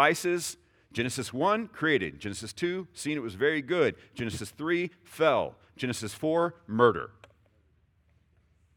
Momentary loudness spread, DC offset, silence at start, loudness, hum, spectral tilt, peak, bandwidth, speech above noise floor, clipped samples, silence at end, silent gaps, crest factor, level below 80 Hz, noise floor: 12 LU; under 0.1%; 0 s; -29 LUFS; none; -4.5 dB/octave; -8 dBFS; over 20 kHz; 38 dB; under 0.1%; 1.65 s; none; 22 dB; -66 dBFS; -67 dBFS